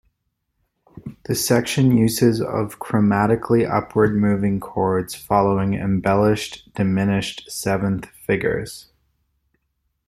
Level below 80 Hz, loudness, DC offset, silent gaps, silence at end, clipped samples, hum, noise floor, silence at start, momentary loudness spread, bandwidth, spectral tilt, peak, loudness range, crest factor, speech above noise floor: -48 dBFS; -20 LUFS; under 0.1%; none; 1.25 s; under 0.1%; none; -74 dBFS; 0.95 s; 10 LU; 15.5 kHz; -6 dB/octave; -2 dBFS; 5 LU; 18 dB; 55 dB